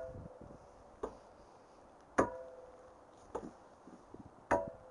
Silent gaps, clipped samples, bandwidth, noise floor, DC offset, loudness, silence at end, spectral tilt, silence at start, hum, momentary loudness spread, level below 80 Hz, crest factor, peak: none; under 0.1%; 11 kHz; -60 dBFS; under 0.1%; -40 LUFS; 0 s; -6 dB/octave; 0 s; none; 24 LU; -64 dBFS; 28 dB; -16 dBFS